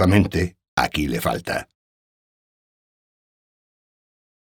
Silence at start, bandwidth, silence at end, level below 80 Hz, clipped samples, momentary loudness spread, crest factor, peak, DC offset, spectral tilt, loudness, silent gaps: 0 s; over 20 kHz; 2.75 s; -42 dBFS; under 0.1%; 9 LU; 24 dB; -2 dBFS; under 0.1%; -6 dB/octave; -23 LUFS; 0.68-0.77 s